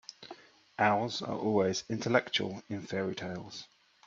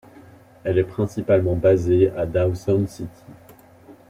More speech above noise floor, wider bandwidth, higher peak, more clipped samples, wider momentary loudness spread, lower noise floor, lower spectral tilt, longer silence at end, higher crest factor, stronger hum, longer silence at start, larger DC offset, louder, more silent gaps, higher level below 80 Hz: second, 22 dB vs 28 dB; second, 7.8 kHz vs 14 kHz; second, -10 dBFS vs -6 dBFS; neither; first, 19 LU vs 12 LU; first, -53 dBFS vs -48 dBFS; second, -4.5 dB/octave vs -8.5 dB/octave; first, 0.4 s vs 0.2 s; first, 24 dB vs 16 dB; neither; second, 0.2 s vs 0.65 s; neither; second, -32 LUFS vs -21 LUFS; neither; second, -72 dBFS vs -48 dBFS